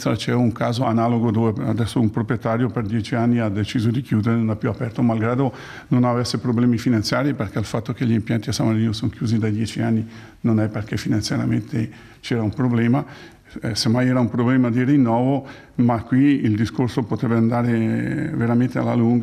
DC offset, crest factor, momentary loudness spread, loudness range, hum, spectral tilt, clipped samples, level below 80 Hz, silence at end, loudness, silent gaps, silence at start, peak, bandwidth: under 0.1%; 14 dB; 7 LU; 3 LU; none; -7 dB/octave; under 0.1%; -52 dBFS; 0 s; -21 LUFS; none; 0 s; -6 dBFS; 13.5 kHz